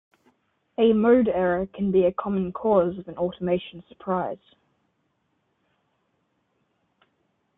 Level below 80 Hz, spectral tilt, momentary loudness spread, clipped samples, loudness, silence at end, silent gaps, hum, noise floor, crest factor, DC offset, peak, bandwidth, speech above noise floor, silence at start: -56 dBFS; -11 dB/octave; 15 LU; under 0.1%; -23 LUFS; 3.2 s; none; none; -72 dBFS; 18 dB; under 0.1%; -8 dBFS; 3.9 kHz; 49 dB; 0.8 s